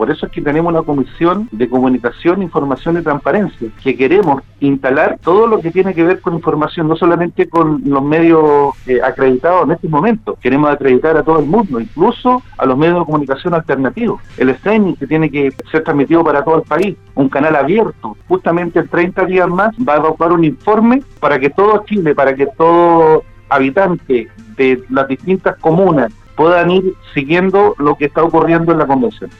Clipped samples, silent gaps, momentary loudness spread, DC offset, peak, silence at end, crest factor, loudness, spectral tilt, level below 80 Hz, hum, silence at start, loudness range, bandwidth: under 0.1%; none; 6 LU; under 0.1%; 0 dBFS; 0.1 s; 12 dB; -12 LUFS; -9 dB/octave; -40 dBFS; none; 0 s; 3 LU; 6.4 kHz